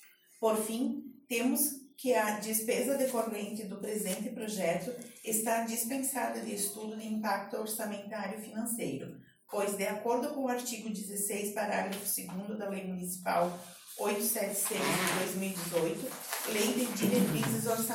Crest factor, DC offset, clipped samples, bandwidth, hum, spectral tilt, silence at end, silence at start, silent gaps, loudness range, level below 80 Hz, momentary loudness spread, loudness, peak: 18 dB; under 0.1%; under 0.1%; 17 kHz; none; -3.5 dB/octave; 0 s; 0 s; none; 4 LU; -74 dBFS; 9 LU; -33 LUFS; -16 dBFS